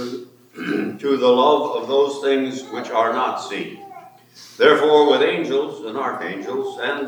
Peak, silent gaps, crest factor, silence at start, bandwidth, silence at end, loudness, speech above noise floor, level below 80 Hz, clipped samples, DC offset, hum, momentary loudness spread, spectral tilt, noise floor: 0 dBFS; none; 20 dB; 0 s; 19.5 kHz; 0 s; -19 LUFS; 24 dB; -80 dBFS; under 0.1%; under 0.1%; none; 15 LU; -4.5 dB/octave; -42 dBFS